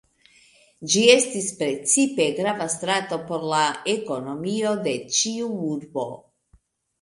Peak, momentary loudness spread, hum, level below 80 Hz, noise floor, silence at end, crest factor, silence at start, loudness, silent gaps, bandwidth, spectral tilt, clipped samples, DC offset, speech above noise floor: 0 dBFS; 12 LU; none; -66 dBFS; -61 dBFS; 0.85 s; 24 dB; 0.8 s; -22 LUFS; none; 11.5 kHz; -2.5 dB/octave; under 0.1%; under 0.1%; 38 dB